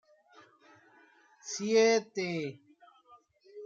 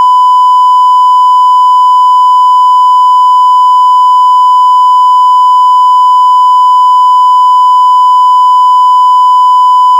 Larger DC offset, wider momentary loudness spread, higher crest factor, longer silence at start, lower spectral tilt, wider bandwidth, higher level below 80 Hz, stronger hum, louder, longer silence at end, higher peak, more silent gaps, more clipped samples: neither; first, 16 LU vs 0 LU; first, 20 dB vs 4 dB; first, 1.45 s vs 0 s; first, -3.5 dB/octave vs 6.5 dB/octave; second, 7.6 kHz vs 11 kHz; first, -84 dBFS vs under -90 dBFS; neither; second, -30 LUFS vs -4 LUFS; about the same, 0 s vs 0 s; second, -14 dBFS vs 0 dBFS; neither; second, under 0.1% vs 2%